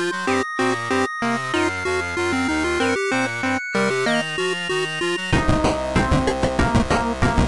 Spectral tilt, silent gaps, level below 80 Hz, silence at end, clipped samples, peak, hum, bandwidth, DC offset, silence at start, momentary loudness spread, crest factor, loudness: -5 dB/octave; none; -32 dBFS; 0 s; under 0.1%; -8 dBFS; none; 11.5 kHz; 0.3%; 0 s; 3 LU; 12 dB; -21 LUFS